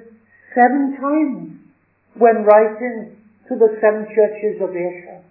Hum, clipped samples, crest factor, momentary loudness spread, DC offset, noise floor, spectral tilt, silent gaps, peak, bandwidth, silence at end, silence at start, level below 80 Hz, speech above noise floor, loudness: none; under 0.1%; 18 dB; 16 LU; under 0.1%; -56 dBFS; -11.5 dB/octave; none; 0 dBFS; 2.9 kHz; 0.15 s; 0.55 s; -78 dBFS; 40 dB; -16 LUFS